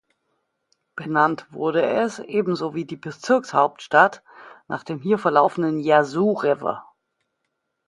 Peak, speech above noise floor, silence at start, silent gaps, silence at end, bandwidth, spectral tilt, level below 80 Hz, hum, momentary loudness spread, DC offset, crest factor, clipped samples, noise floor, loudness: 0 dBFS; 56 dB; 0.95 s; none; 1.05 s; 11.5 kHz; -6 dB/octave; -70 dBFS; none; 15 LU; under 0.1%; 22 dB; under 0.1%; -77 dBFS; -21 LUFS